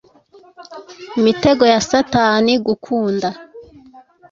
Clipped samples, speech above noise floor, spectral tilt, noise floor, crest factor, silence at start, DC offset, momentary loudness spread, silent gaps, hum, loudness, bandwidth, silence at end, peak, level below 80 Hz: under 0.1%; 33 dB; -4.5 dB/octave; -48 dBFS; 16 dB; 0.6 s; under 0.1%; 23 LU; none; none; -15 LUFS; 7.6 kHz; 0.7 s; 0 dBFS; -50 dBFS